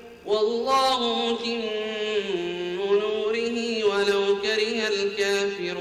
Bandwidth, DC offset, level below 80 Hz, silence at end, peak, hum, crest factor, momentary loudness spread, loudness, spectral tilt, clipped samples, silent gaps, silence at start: 13.5 kHz; under 0.1%; -64 dBFS; 0 s; -12 dBFS; none; 12 dB; 6 LU; -24 LUFS; -3 dB/octave; under 0.1%; none; 0 s